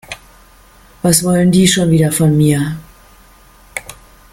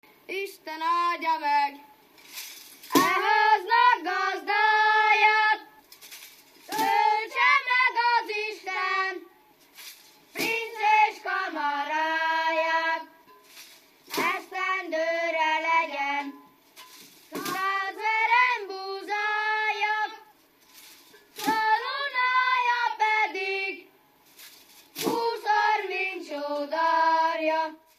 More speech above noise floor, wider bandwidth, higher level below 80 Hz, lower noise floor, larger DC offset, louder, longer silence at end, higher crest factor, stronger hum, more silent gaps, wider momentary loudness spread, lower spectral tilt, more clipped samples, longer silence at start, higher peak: about the same, 33 dB vs 32 dB; about the same, 16.5 kHz vs 15 kHz; first, -42 dBFS vs -82 dBFS; second, -44 dBFS vs -59 dBFS; neither; first, -12 LUFS vs -25 LUFS; first, 0.4 s vs 0.25 s; about the same, 16 dB vs 20 dB; neither; neither; first, 18 LU vs 15 LU; first, -5 dB/octave vs -1.5 dB/octave; neither; second, 0.1 s vs 0.3 s; first, 0 dBFS vs -6 dBFS